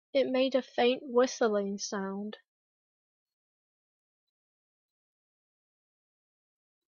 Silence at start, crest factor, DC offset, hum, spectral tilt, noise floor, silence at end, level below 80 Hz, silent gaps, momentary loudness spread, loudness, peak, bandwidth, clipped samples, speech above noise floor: 0.15 s; 22 dB; under 0.1%; none; -4 dB/octave; under -90 dBFS; 4.5 s; -82 dBFS; none; 10 LU; -30 LUFS; -14 dBFS; 7.4 kHz; under 0.1%; over 60 dB